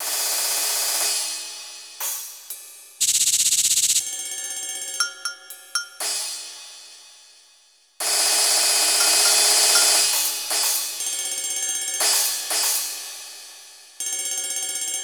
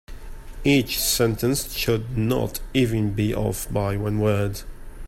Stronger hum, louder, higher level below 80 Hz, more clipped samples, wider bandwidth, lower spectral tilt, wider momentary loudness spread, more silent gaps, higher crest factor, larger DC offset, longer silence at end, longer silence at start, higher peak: neither; first, -19 LUFS vs -23 LUFS; second, -70 dBFS vs -36 dBFS; neither; first, over 20 kHz vs 16.5 kHz; second, 3.5 dB/octave vs -5 dB/octave; first, 20 LU vs 6 LU; neither; about the same, 20 dB vs 16 dB; neither; about the same, 0 s vs 0 s; about the same, 0 s vs 0.1 s; about the same, -4 dBFS vs -6 dBFS